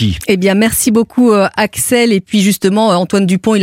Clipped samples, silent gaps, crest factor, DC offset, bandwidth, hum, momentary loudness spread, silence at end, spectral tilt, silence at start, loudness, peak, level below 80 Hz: under 0.1%; none; 10 dB; under 0.1%; 16.5 kHz; none; 3 LU; 0 s; -4.5 dB/octave; 0 s; -11 LUFS; 0 dBFS; -38 dBFS